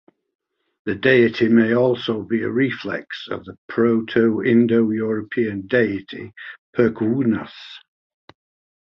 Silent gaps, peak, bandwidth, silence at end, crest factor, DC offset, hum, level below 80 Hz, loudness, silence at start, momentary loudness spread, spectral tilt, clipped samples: 3.58-3.69 s, 6.58-6.73 s; -2 dBFS; 5.8 kHz; 1.15 s; 18 dB; under 0.1%; none; -58 dBFS; -19 LUFS; 0.85 s; 17 LU; -8.5 dB/octave; under 0.1%